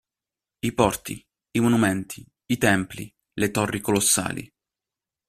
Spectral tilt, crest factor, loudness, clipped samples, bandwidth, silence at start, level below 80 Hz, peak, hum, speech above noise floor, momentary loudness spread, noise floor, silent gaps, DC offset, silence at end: -4 dB/octave; 22 dB; -23 LUFS; under 0.1%; 15.5 kHz; 0.65 s; -52 dBFS; -2 dBFS; none; 67 dB; 17 LU; -90 dBFS; none; under 0.1%; 0.85 s